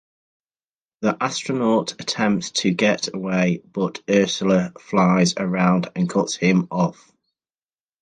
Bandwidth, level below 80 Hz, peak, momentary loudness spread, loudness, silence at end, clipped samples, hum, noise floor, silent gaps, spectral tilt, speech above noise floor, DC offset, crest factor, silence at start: 9.6 kHz; -60 dBFS; -4 dBFS; 6 LU; -21 LUFS; 1.1 s; under 0.1%; none; under -90 dBFS; none; -5 dB/octave; over 70 dB; under 0.1%; 18 dB; 1 s